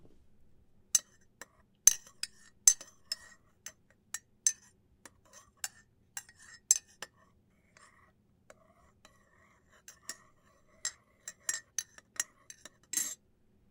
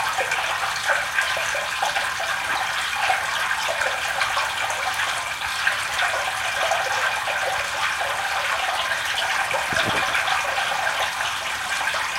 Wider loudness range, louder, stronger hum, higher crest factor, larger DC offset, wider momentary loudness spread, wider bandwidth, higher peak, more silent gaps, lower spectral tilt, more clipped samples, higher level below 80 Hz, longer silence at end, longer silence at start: first, 18 LU vs 1 LU; second, -32 LUFS vs -22 LUFS; neither; first, 34 dB vs 18 dB; neither; first, 26 LU vs 3 LU; about the same, 17.5 kHz vs 17 kHz; about the same, -4 dBFS vs -6 dBFS; neither; second, 2.5 dB/octave vs 0 dB/octave; neither; second, -72 dBFS vs -54 dBFS; first, 0.55 s vs 0 s; first, 0.95 s vs 0 s